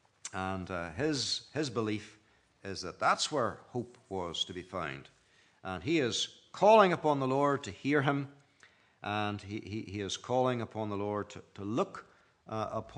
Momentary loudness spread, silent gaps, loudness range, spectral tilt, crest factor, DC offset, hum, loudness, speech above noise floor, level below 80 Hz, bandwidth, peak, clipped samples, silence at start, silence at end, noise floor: 13 LU; none; 7 LU; -4.5 dB/octave; 24 dB; under 0.1%; none; -33 LUFS; 32 dB; -70 dBFS; 10.5 kHz; -10 dBFS; under 0.1%; 0.25 s; 0 s; -64 dBFS